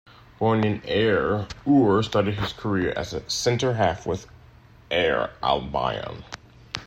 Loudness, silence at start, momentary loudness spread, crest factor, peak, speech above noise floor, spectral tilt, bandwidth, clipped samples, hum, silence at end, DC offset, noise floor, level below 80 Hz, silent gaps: -24 LUFS; 0.4 s; 12 LU; 18 dB; -6 dBFS; 27 dB; -5.5 dB/octave; 15 kHz; under 0.1%; none; 0 s; under 0.1%; -50 dBFS; -48 dBFS; none